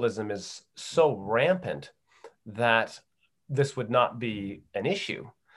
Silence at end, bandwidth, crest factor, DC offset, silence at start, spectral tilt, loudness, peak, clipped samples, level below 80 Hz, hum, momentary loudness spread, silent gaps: 0.25 s; 12 kHz; 20 dB; under 0.1%; 0 s; -5 dB/octave; -28 LUFS; -8 dBFS; under 0.1%; -70 dBFS; none; 13 LU; none